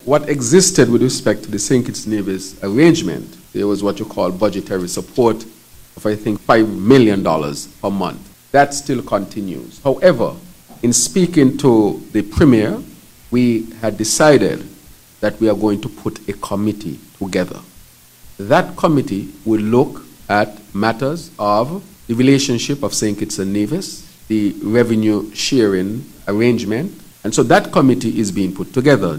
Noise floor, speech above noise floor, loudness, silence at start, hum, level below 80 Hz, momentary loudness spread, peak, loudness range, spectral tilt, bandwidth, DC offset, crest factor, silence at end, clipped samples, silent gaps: -44 dBFS; 29 dB; -16 LUFS; 0.05 s; none; -42 dBFS; 13 LU; 0 dBFS; 5 LU; -5 dB/octave; 16.5 kHz; under 0.1%; 16 dB; 0 s; under 0.1%; none